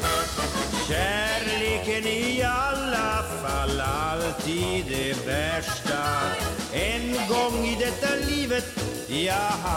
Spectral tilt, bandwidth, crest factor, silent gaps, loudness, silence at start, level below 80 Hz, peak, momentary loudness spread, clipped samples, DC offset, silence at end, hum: -3.5 dB/octave; 16.5 kHz; 14 dB; none; -26 LUFS; 0 s; -38 dBFS; -12 dBFS; 3 LU; under 0.1%; under 0.1%; 0 s; none